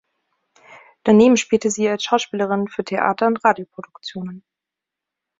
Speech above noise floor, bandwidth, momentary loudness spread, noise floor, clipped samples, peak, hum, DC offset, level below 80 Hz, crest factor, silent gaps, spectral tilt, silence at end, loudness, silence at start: 67 dB; 7.8 kHz; 19 LU; -85 dBFS; under 0.1%; -2 dBFS; none; under 0.1%; -60 dBFS; 18 dB; none; -4.5 dB/octave; 1 s; -18 LUFS; 0.7 s